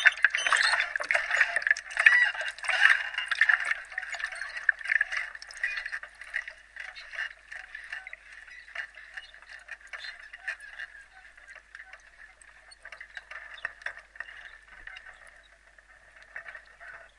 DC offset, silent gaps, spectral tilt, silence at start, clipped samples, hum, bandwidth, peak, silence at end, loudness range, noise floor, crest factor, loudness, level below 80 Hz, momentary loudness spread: under 0.1%; none; 2 dB/octave; 0 s; under 0.1%; none; 11.5 kHz; -2 dBFS; 0.15 s; 20 LU; -58 dBFS; 28 dB; -27 LUFS; -66 dBFS; 24 LU